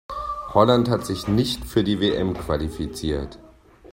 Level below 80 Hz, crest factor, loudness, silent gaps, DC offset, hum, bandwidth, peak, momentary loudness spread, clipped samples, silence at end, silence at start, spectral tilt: -40 dBFS; 22 dB; -23 LUFS; none; under 0.1%; none; 16.5 kHz; -2 dBFS; 12 LU; under 0.1%; 0.05 s; 0.1 s; -6 dB/octave